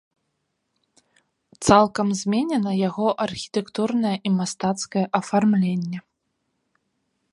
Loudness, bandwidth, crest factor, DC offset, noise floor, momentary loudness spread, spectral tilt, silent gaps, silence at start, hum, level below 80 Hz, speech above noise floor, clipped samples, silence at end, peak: -22 LUFS; 11.5 kHz; 22 dB; under 0.1%; -75 dBFS; 10 LU; -5.5 dB/octave; none; 1.6 s; none; -56 dBFS; 54 dB; under 0.1%; 1.3 s; 0 dBFS